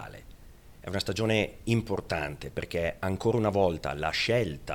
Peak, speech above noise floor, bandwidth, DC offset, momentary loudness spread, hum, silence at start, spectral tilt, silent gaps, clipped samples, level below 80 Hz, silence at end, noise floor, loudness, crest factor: -12 dBFS; 22 dB; 18.5 kHz; under 0.1%; 9 LU; none; 0 s; -5.5 dB/octave; none; under 0.1%; -48 dBFS; 0 s; -51 dBFS; -29 LUFS; 18 dB